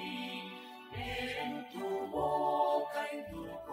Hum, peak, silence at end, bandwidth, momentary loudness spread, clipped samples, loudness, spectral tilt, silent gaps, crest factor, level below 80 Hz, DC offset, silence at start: none; -20 dBFS; 0 s; 16 kHz; 13 LU; under 0.1%; -37 LUFS; -5 dB/octave; none; 18 dB; -60 dBFS; under 0.1%; 0 s